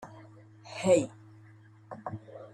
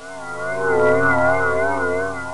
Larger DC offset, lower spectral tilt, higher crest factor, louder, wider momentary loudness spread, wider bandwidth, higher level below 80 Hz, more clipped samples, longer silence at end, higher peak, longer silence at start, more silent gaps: neither; about the same, -5.5 dB/octave vs -6 dB/octave; first, 22 dB vs 14 dB; second, -30 LUFS vs -19 LUFS; first, 25 LU vs 10 LU; about the same, 12 kHz vs 11.5 kHz; second, -72 dBFS vs -52 dBFS; neither; about the same, 0.05 s vs 0 s; second, -12 dBFS vs -6 dBFS; about the same, 0 s vs 0 s; neither